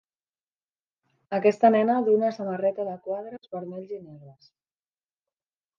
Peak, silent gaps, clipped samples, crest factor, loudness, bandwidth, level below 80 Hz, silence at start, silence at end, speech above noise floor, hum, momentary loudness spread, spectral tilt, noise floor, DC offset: -6 dBFS; none; under 0.1%; 22 dB; -24 LUFS; 7.4 kHz; -80 dBFS; 1.3 s; 1.45 s; over 65 dB; none; 18 LU; -7.5 dB/octave; under -90 dBFS; under 0.1%